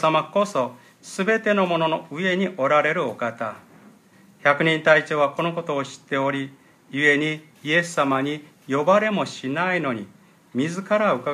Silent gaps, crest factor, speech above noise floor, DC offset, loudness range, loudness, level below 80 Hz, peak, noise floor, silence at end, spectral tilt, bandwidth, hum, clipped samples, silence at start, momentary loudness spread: none; 20 dB; 31 dB; under 0.1%; 2 LU; -22 LUFS; -74 dBFS; -2 dBFS; -53 dBFS; 0 s; -5 dB/octave; 14 kHz; none; under 0.1%; 0 s; 12 LU